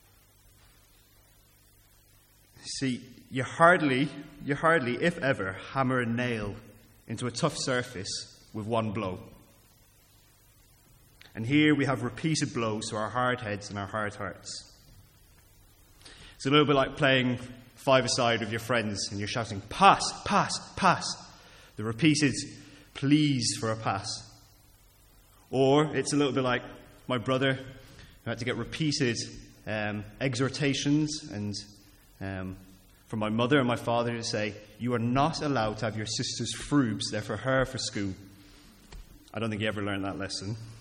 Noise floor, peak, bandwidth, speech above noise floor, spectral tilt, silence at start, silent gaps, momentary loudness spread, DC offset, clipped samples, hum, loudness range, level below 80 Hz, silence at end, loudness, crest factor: -60 dBFS; -6 dBFS; 16.5 kHz; 32 dB; -4.5 dB/octave; 2.6 s; none; 16 LU; under 0.1%; under 0.1%; none; 7 LU; -56 dBFS; 0 s; -28 LUFS; 24 dB